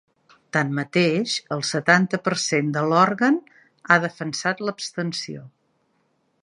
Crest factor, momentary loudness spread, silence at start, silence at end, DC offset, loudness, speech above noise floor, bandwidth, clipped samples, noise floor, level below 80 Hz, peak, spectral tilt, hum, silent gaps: 22 dB; 10 LU; 0.55 s; 0.95 s; under 0.1%; -22 LUFS; 46 dB; 11 kHz; under 0.1%; -68 dBFS; -70 dBFS; 0 dBFS; -4.5 dB/octave; none; none